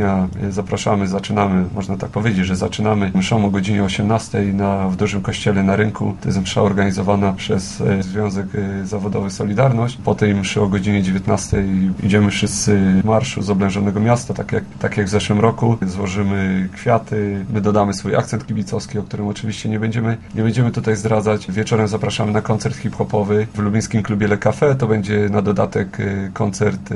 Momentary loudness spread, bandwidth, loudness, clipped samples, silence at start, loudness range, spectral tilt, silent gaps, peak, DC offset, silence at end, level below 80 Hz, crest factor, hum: 6 LU; 11.5 kHz; -18 LUFS; under 0.1%; 0 s; 3 LU; -6 dB/octave; none; 0 dBFS; under 0.1%; 0 s; -42 dBFS; 16 dB; none